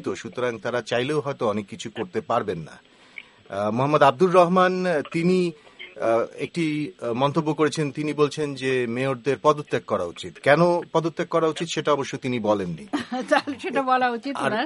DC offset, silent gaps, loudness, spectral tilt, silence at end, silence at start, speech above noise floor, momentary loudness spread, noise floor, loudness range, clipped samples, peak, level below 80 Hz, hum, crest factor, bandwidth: under 0.1%; none; -23 LUFS; -6 dB/octave; 0 s; 0 s; 23 dB; 12 LU; -46 dBFS; 4 LU; under 0.1%; -2 dBFS; -66 dBFS; none; 22 dB; 11.5 kHz